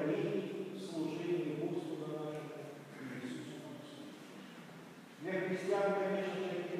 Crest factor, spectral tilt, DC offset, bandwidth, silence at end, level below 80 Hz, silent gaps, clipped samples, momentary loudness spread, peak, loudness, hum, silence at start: 16 dB; -6.5 dB/octave; under 0.1%; 15.5 kHz; 0 s; under -90 dBFS; none; under 0.1%; 17 LU; -24 dBFS; -40 LUFS; none; 0 s